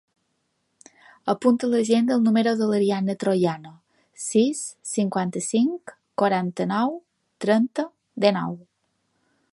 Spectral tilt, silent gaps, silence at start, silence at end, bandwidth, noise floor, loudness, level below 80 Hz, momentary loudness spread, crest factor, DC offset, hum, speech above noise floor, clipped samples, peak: -5.5 dB/octave; none; 1.25 s; 0.95 s; 11.5 kHz; -73 dBFS; -23 LUFS; -72 dBFS; 12 LU; 22 dB; under 0.1%; none; 51 dB; under 0.1%; -2 dBFS